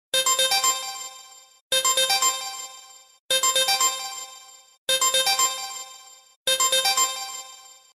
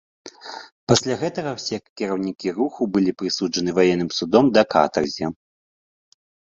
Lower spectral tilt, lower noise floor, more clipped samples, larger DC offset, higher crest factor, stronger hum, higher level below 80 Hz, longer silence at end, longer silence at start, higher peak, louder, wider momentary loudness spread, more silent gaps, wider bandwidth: second, 3 dB/octave vs -5 dB/octave; second, -47 dBFS vs under -90 dBFS; neither; neither; about the same, 16 dB vs 20 dB; neither; second, -70 dBFS vs -56 dBFS; second, 0.35 s vs 1.25 s; about the same, 0.15 s vs 0.25 s; second, -8 dBFS vs -2 dBFS; about the same, -21 LUFS vs -21 LUFS; first, 17 LU vs 13 LU; first, 1.61-1.70 s, 3.20-3.29 s, 4.78-4.87 s, 6.36-6.46 s vs 0.72-0.87 s, 1.89-1.96 s; first, 14.5 kHz vs 7.8 kHz